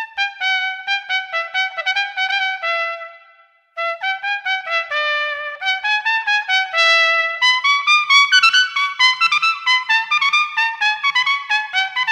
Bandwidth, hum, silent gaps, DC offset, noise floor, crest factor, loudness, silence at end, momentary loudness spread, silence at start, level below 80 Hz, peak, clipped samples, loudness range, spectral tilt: 14.5 kHz; none; none; under 0.1%; -52 dBFS; 18 dB; -16 LUFS; 0 s; 10 LU; 0 s; -72 dBFS; 0 dBFS; under 0.1%; 8 LU; 4 dB/octave